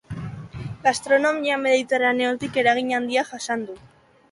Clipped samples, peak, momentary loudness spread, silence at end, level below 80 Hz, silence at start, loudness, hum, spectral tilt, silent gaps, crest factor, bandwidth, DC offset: under 0.1%; -6 dBFS; 15 LU; 0.55 s; -54 dBFS; 0.1 s; -21 LUFS; none; -4 dB/octave; none; 18 dB; 11.5 kHz; under 0.1%